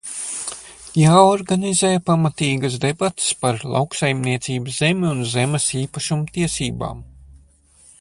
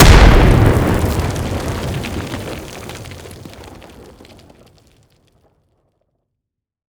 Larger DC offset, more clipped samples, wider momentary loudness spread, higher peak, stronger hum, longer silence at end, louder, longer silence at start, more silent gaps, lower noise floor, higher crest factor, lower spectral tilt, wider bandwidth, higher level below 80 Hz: neither; second, under 0.1% vs 0.5%; second, 11 LU vs 25 LU; about the same, 0 dBFS vs 0 dBFS; neither; second, 0.65 s vs 3.2 s; second, -19 LUFS vs -15 LUFS; about the same, 0.05 s vs 0 s; neither; second, -52 dBFS vs -79 dBFS; about the same, 20 dB vs 16 dB; about the same, -4.5 dB/octave vs -5.5 dB/octave; second, 11.5 kHz vs over 20 kHz; second, -48 dBFS vs -18 dBFS